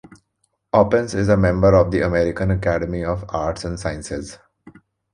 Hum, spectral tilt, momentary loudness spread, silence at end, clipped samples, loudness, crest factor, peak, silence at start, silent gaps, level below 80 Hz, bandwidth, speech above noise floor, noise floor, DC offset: none; -7 dB/octave; 13 LU; 0.45 s; under 0.1%; -19 LUFS; 18 dB; -2 dBFS; 0.75 s; none; -36 dBFS; 10.5 kHz; 52 dB; -70 dBFS; under 0.1%